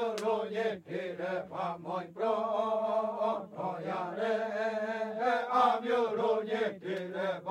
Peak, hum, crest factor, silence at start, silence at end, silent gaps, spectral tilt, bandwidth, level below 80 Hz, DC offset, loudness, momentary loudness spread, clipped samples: -14 dBFS; none; 18 dB; 0 s; 0 s; none; -5.5 dB/octave; 12.5 kHz; -84 dBFS; under 0.1%; -33 LUFS; 9 LU; under 0.1%